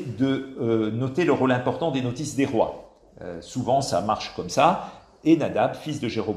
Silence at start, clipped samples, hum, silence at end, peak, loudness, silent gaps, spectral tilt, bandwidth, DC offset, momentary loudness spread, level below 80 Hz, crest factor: 0 s; under 0.1%; none; 0 s; -4 dBFS; -24 LUFS; none; -6 dB/octave; 13 kHz; under 0.1%; 10 LU; -56 dBFS; 20 dB